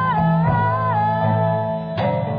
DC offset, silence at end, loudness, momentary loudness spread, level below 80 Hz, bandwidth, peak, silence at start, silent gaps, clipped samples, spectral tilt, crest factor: under 0.1%; 0 s; -19 LUFS; 5 LU; -44 dBFS; 5 kHz; -6 dBFS; 0 s; none; under 0.1%; -10.5 dB/octave; 12 dB